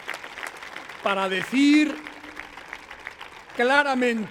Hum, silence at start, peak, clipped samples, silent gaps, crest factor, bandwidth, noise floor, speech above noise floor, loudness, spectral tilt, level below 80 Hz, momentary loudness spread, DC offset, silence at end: none; 0 s; -4 dBFS; under 0.1%; none; 20 dB; 15 kHz; -42 dBFS; 21 dB; -22 LUFS; -4 dB/octave; -64 dBFS; 20 LU; under 0.1%; 0 s